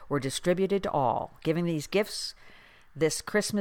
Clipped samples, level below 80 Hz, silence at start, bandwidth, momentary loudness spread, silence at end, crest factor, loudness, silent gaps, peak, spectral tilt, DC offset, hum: under 0.1%; -56 dBFS; 0 s; 18.5 kHz; 5 LU; 0 s; 18 dB; -29 LUFS; none; -12 dBFS; -4.5 dB/octave; under 0.1%; none